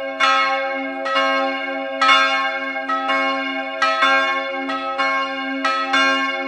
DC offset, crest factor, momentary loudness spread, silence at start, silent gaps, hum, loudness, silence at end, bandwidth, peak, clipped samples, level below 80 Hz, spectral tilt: under 0.1%; 18 dB; 9 LU; 0 s; none; none; -18 LUFS; 0 s; 11.5 kHz; 0 dBFS; under 0.1%; -68 dBFS; -1 dB/octave